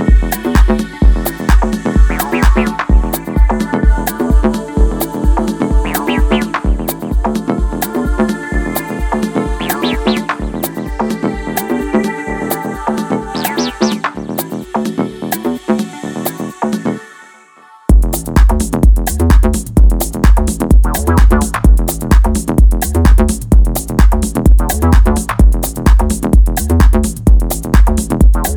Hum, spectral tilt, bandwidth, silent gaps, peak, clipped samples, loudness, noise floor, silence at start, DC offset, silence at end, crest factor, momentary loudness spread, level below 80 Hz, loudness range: none; -6 dB/octave; 19.5 kHz; none; 0 dBFS; under 0.1%; -14 LUFS; -42 dBFS; 0 s; under 0.1%; 0 s; 12 dB; 7 LU; -12 dBFS; 6 LU